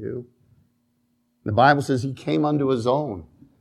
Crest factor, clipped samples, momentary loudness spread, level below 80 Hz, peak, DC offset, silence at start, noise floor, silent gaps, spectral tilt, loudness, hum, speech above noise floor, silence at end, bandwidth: 22 dB; under 0.1%; 17 LU; -58 dBFS; -2 dBFS; under 0.1%; 0 s; -68 dBFS; none; -7 dB/octave; -22 LUFS; none; 47 dB; 0.35 s; 12.5 kHz